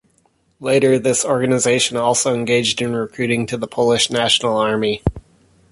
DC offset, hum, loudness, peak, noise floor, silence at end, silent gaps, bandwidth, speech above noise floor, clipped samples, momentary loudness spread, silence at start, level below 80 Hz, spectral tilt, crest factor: under 0.1%; none; -17 LUFS; -2 dBFS; -60 dBFS; 0.5 s; none; 11.5 kHz; 43 dB; under 0.1%; 7 LU; 0.6 s; -40 dBFS; -3.5 dB/octave; 16 dB